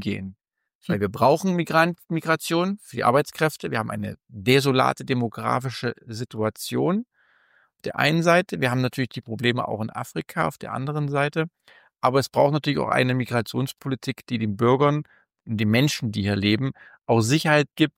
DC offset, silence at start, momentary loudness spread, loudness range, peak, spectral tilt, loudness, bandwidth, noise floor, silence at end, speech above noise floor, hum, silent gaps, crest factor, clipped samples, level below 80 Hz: under 0.1%; 0 s; 11 LU; 3 LU; -4 dBFS; -5.5 dB/octave; -23 LUFS; 16.5 kHz; -62 dBFS; 0.1 s; 39 dB; none; 0.75-0.81 s; 18 dB; under 0.1%; -62 dBFS